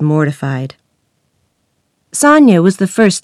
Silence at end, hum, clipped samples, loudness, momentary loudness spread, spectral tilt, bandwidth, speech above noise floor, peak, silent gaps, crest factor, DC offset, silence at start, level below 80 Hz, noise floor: 0.05 s; none; 0.5%; -11 LUFS; 16 LU; -5.5 dB/octave; 13.5 kHz; 53 dB; 0 dBFS; none; 12 dB; under 0.1%; 0 s; -62 dBFS; -64 dBFS